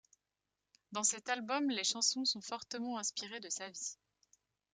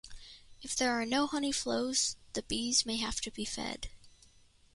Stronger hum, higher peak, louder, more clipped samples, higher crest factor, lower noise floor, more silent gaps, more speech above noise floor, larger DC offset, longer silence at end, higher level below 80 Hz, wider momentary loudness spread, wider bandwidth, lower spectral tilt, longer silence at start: neither; about the same, -18 dBFS vs -16 dBFS; second, -36 LUFS vs -33 LUFS; neither; first, 24 dB vs 18 dB; first, -89 dBFS vs -63 dBFS; neither; first, 51 dB vs 29 dB; neither; first, 0.8 s vs 0.65 s; second, -88 dBFS vs -56 dBFS; second, 11 LU vs 19 LU; about the same, 11 kHz vs 11.5 kHz; about the same, -0.5 dB/octave vs -1.5 dB/octave; first, 0.9 s vs 0.05 s